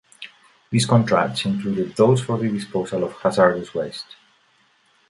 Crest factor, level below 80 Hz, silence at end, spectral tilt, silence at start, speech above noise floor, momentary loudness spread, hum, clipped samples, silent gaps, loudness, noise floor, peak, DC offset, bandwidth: 20 dB; -58 dBFS; 1.05 s; -6 dB/octave; 0.2 s; 40 dB; 18 LU; none; under 0.1%; none; -21 LUFS; -60 dBFS; -2 dBFS; under 0.1%; 11.5 kHz